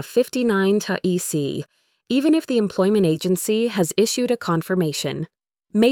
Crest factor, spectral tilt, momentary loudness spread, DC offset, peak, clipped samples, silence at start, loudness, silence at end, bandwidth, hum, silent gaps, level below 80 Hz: 18 dB; -5 dB/octave; 9 LU; under 0.1%; -2 dBFS; under 0.1%; 0 s; -21 LUFS; 0 s; 19 kHz; none; none; -62 dBFS